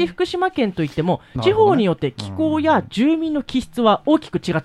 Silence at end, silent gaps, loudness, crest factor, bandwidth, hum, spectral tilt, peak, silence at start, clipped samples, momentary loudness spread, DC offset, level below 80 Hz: 0 s; none; -19 LUFS; 16 dB; 12 kHz; none; -7 dB/octave; -2 dBFS; 0 s; under 0.1%; 7 LU; under 0.1%; -48 dBFS